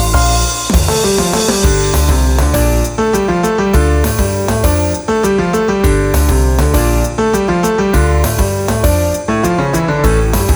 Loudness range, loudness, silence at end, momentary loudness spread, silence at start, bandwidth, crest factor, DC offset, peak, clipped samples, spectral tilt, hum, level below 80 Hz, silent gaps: 1 LU; -13 LUFS; 0 s; 3 LU; 0 s; over 20 kHz; 12 dB; under 0.1%; 0 dBFS; under 0.1%; -5 dB/octave; none; -16 dBFS; none